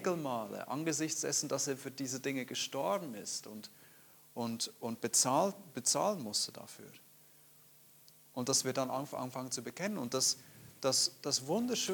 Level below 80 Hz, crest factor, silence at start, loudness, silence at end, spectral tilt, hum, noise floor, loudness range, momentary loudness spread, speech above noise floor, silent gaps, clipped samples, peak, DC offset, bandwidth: -84 dBFS; 22 dB; 0 s; -35 LUFS; 0 s; -2.5 dB/octave; none; -62 dBFS; 4 LU; 11 LU; 26 dB; none; under 0.1%; -16 dBFS; under 0.1%; 19 kHz